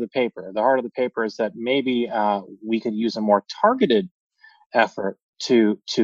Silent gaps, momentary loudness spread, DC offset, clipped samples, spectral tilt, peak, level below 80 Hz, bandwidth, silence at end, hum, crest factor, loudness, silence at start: 4.11-4.30 s, 4.66-4.70 s, 5.23-5.33 s; 8 LU; under 0.1%; under 0.1%; -5.5 dB/octave; -2 dBFS; -68 dBFS; 7.6 kHz; 0 s; none; 18 dB; -22 LUFS; 0 s